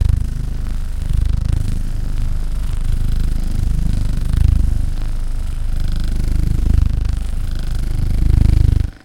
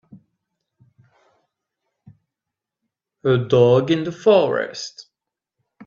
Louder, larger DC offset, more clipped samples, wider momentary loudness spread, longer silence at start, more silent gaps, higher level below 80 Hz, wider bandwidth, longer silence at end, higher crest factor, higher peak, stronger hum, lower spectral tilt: second, -21 LUFS vs -18 LUFS; neither; neither; second, 9 LU vs 14 LU; second, 0 s vs 0.15 s; neither; first, -16 dBFS vs -62 dBFS; first, 11.5 kHz vs 7.4 kHz; second, 0.15 s vs 0.85 s; second, 14 dB vs 20 dB; about the same, 0 dBFS vs -2 dBFS; neither; about the same, -7 dB/octave vs -6.5 dB/octave